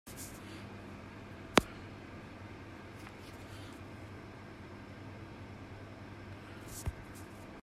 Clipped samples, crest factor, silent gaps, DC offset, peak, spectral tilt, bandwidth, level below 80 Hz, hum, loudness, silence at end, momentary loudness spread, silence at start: under 0.1%; 38 dB; none; under 0.1%; -6 dBFS; -4.5 dB/octave; 16 kHz; -58 dBFS; none; -43 LUFS; 0 s; 11 LU; 0.05 s